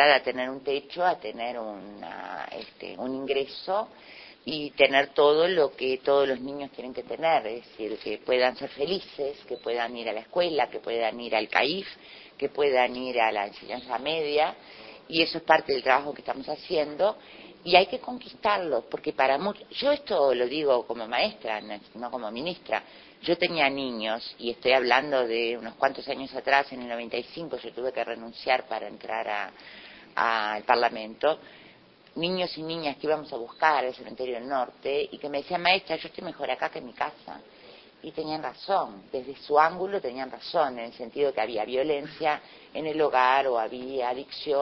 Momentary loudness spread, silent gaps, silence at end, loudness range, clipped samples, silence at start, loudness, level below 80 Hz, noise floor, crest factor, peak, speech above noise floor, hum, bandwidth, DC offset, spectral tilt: 14 LU; none; 0 s; 5 LU; under 0.1%; 0 s; -27 LUFS; -66 dBFS; -55 dBFS; 24 dB; -4 dBFS; 27 dB; none; 6.2 kHz; under 0.1%; -5.5 dB/octave